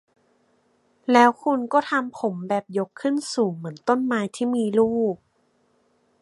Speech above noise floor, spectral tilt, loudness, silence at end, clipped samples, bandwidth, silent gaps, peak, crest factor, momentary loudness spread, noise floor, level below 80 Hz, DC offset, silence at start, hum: 44 dB; -5.5 dB/octave; -23 LUFS; 1.05 s; under 0.1%; 11.5 kHz; none; -2 dBFS; 22 dB; 11 LU; -66 dBFS; -70 dBFS; under 0.1%; 1.1 s; none